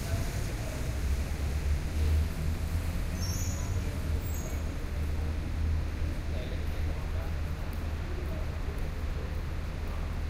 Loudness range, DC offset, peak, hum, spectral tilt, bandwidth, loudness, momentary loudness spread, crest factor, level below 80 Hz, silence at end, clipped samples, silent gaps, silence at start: 3 LU; under 0.1%; -18 dBFS; none; -5.5 dB/octave; 16 kHz; -34 LUFS; 4 LU; 12 dB; -34 dBFS; 0 s; under 0.1%; none; 0 s